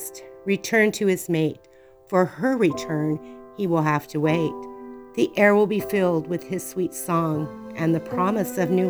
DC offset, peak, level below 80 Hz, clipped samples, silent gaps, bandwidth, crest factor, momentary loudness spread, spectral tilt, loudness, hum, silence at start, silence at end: under 0.1%; -4 dBFS; -60 dBFS; under 0.1%; none; over 20 kHz; 18 dB; 13 LU; -6 dB/octave; -23 LUFS; none; 0 s; 0 s